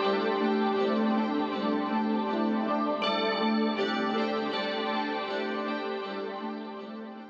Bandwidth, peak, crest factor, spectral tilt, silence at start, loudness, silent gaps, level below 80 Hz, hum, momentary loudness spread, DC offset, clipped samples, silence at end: 7.4 kHz; -16 dBFS; 14 dB; -6.5 dB/octave; 0 s; -29 LUFS; none; -78 dBFS; none; 8 LU; under 0.1%; under 0.1%; 0 s